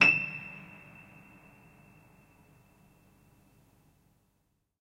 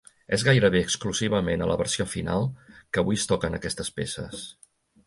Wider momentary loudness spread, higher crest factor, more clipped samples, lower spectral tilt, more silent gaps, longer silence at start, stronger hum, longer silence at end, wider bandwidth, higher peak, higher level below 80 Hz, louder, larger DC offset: first, 29 LU vs 12 LU; first, 28 dB vs 20 dB; neither; about the same, -3.5 dB/octave vs -4.5 dB/octave; neither; second, 0 s vs 0.3 s; neither; first, 4.15 s vs 0.55 s; first, 16 kHz vs 11.5 kHz; about the same, -8 dBFS vs -6 dBFS; second, -70 dBFS vs -46 dBFS; second, -29 LUFS vs -25 LUFS; neither